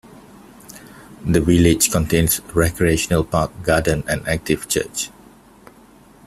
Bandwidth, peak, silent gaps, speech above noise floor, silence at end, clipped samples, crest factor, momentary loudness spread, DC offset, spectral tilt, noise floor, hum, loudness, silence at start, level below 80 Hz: 15 kHz; 0 dBFS; none; 30 dB; 1.2 s; under 0.1%; 20 dB; 14 LU; under 0.1%; -4.5 dB/octave; -47 dBFS; none; -18 LUFS; 0.7 s; -36 dBFS